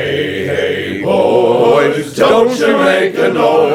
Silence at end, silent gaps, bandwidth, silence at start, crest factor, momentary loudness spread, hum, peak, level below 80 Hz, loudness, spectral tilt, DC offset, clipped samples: 0 s; none; 15.5 kHz; 0 s; 10 dB; 6 LU; none; 0 dBFS; -50 dBFS; -12 LUFS; -5 dB/octave; under 0.1%; under 0.1%